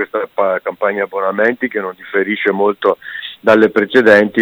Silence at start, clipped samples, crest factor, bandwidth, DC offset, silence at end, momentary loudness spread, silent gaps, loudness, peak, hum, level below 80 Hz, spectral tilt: 0 s; under 0.1%; 14 dB; over 20 kHz; under 0.1%; 0 s; 10 LU; none; -14 LUFS; 0 dBFS; none; -58 dBFS; -6.5 dB/octave